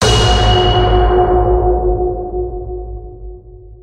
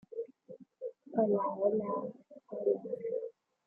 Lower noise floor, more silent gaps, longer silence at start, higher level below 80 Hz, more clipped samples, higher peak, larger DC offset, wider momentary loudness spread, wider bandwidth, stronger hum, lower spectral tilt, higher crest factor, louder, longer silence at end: second, -35 dBFS vs -55 dBFS; neither; about the same, 0 s vs 0.1 s; first, -18 dBFS vs -84 dBFS; neither; first, 0 dBFS vs -16 dBFS; neither; first, 20 LU vs 16 LU; first, 10.5 kHz vs 2.4 kHz; neither; second, -5.5 dB/octave vs -12 dB/octave; second, 12 dB vs 20 dB; first, -13 LUFS vs -35 LUFS; second, 0.05 s vs 0.35 s